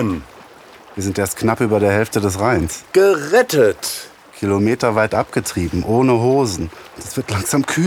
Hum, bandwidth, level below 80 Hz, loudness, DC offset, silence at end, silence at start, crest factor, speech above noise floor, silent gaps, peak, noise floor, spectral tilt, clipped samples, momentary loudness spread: none; 18.5 kHz; -42 dBFS; -17 LUFS; under 0.1%; 0 s; 0 s; 16 dB; 25 dB; none; -2 dBFS; -42 dBFS; -5 dB/octave; under 0.1%; 12 LU